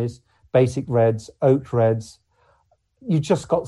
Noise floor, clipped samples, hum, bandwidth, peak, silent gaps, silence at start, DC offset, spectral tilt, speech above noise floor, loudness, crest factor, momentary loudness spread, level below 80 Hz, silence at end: -64 dBFS; under 0.1%; none; 11.5 kHz; -4 dBFS; none; 0 s; under 0.1%; -7.5 dB/octave; 44 dB; -21 LUFS; 18 dB; 7 LU; -54 dBFS; 0 s